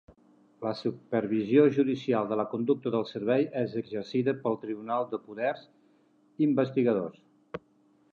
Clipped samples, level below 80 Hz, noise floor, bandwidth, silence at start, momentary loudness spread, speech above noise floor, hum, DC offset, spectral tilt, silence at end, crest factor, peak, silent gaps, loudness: under 0.1%; -74 dBFS; -65 dBFS; 7 kHz; 0.6 s; 12 LU; 37 dB; none; under 0.1%; -8.5 dB/octave; 0.55 s; 20 dB; -8 dBFS; none; -29 LUFS